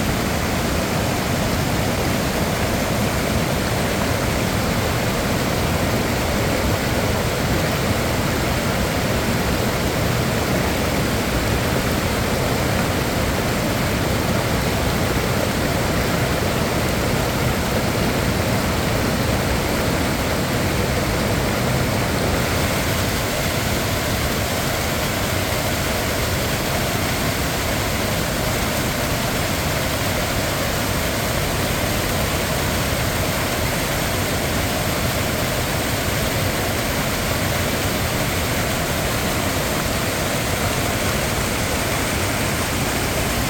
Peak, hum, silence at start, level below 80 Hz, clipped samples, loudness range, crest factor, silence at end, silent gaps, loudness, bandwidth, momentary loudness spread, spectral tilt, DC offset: -6 dBFS; none; 0 s; -30 dBFS; under 0.1%; 1 LU; 14 dB; 0 s; none; -20 LUFS; over 20 kHz; 1 LU; -4 dB/octave; under 0.1%